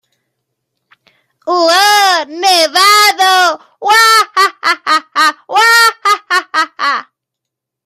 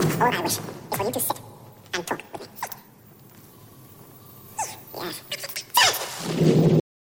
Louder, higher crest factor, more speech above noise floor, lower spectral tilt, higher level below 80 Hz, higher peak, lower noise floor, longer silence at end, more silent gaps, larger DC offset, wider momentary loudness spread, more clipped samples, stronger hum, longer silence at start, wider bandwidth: first, -9 LUFS vs -24 LUFS; second, 12 dB vs 22 dB; first, 69 dB vs 22 dB; second, 1.5 dB/octave vs -4 dB/octave; second, -72 dBFS vs -58 dBFS; first, 0 dBFS vs -4 dBFS; first, -79 dBFS vs -50 dBFS; first, 0.85 s vs 0.4 s; neither; neither; second, 9 LU vs 18 LU; neither; neither; first, 1.45 s vs 0 s; about the same, 16.5 kHz vs 17 kHz